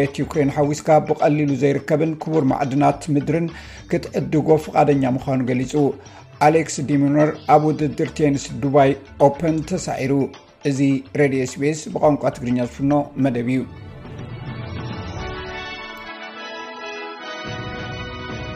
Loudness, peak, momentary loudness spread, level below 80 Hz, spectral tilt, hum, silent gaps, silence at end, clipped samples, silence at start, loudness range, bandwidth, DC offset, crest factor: -20 LUFS; -2 dBFS; 15 LU; -46 dBFS; -6.5 dB/octave; none; none; 0 s; under 0.1%; 0 s; 12 LU; 12 kHz; under 0.1%; 18 dB